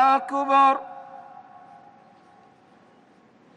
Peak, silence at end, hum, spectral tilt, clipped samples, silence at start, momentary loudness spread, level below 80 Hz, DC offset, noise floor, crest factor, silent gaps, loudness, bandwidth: -8 dBFS; 2.35 s; none; -3.5 dB/octave; under 0.1%; 0 s; 26 LU; -80 dBFS; under 0.1%; -56 dBFS; 18 dB; none; -20 LUFS; 9 kHz